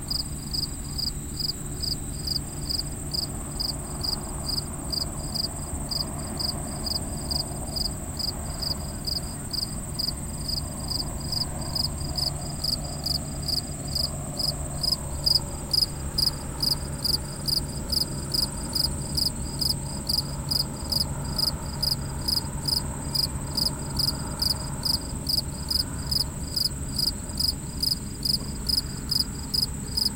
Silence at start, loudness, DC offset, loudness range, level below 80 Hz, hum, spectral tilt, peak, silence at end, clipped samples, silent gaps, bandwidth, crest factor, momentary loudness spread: 0 s; -27 LUFS; under 0.1%; 4 LU; -38 dBFS; none; -3 dB/octave; -8 dBFS; 0 s; under 0.1%; none; 17 kHz; 20 dB; 4 LU